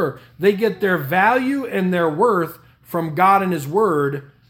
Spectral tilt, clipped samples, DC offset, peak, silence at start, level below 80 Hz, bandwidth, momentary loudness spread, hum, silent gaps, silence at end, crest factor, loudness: -6.5 dB/octave; under 0.1%; under 0.1%; -2 dBFS; 0 s; -60 dBFS; 18 kHz; 9 LU; none; none; 0.25 s; 16 dB; -19 LUFS